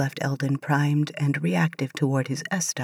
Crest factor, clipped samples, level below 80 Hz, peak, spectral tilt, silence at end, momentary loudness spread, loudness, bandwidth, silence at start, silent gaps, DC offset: 16 dB; under 0.1%; -78 dBFS; -8 dBFS; -5.5 dB/octave; 0 s; 4 LU; -25 LUFS; 15 kHz; 0 s; none; under 0.1%